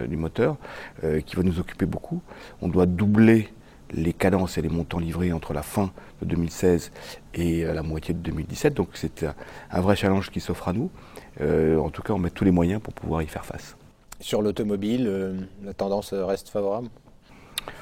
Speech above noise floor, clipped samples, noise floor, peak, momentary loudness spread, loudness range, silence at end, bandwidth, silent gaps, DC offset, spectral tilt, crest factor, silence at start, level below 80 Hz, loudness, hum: 25 dB; under 0.1%; -49 dBFS; -4 dBFS; 14 LU; 5 LU; 0 s; 16.5 kHz; none; under 0.1%; -7 dB/octave; 20 dB; 0 s; -42 dBFS; -25 LUFS; none